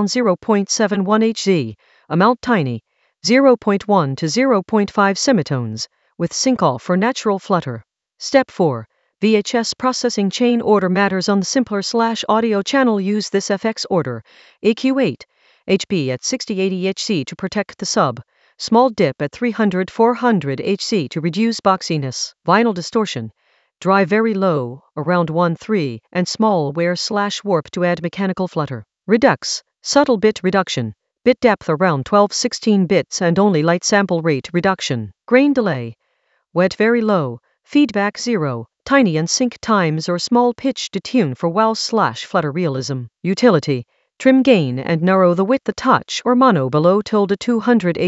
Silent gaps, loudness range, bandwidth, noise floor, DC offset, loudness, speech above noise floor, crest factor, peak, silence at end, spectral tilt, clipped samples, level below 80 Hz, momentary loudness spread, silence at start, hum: none; 3 LU; 8.2 kHz; -66 dBFS; under 0.1%; -17 LUFS; 49 dB; 16 dB; 0 dBFS; 0 s; -5 dB/octave; under 0.1%; -58 dBFS; 9 LU; 0 s; none